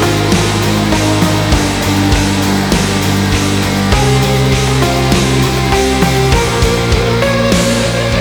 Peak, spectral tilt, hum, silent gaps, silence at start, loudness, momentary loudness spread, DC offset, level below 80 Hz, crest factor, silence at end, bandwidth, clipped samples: 0 dBFS; -5 dB/octave; none; none; 0 s; -12 LUFS; 2 LU; under 0.1%; -22 dBFS; 10 dB; 0 s; over 20 kHz; under 0.1%